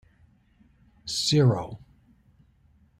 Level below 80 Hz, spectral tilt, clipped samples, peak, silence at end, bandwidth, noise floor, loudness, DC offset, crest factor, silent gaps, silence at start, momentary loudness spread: -58 dBFS; -5.5 dB/octave; under 0.1%; -10 dBFS; 1.25 s; 15 kHz; -61 dBFS; -24 LUFS; under 0.1%; 20 dB; none; 1.05 s; 21 LU